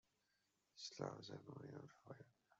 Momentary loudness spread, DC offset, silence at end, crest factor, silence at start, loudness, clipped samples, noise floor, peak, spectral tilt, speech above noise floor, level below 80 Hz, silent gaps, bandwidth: 12 LU; under 0.1%; 0.05 s; 24 dB; 0.75 s; -55 LUFS; under 0.1%; -86 dBFS; -32 dBFS; -4.5 dB/octave; 31 dB; under -90 dBFS; none; 8 kHz